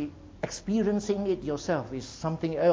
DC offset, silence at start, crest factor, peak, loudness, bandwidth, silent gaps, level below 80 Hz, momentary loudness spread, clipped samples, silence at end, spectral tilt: under 0.1%; 0 s; 18 dB; -12 dBFS; -30 LUFS; 8 kHz; none; -52 dBFS; 11 LU; under 0.1%; 0 s; -6 dB/octave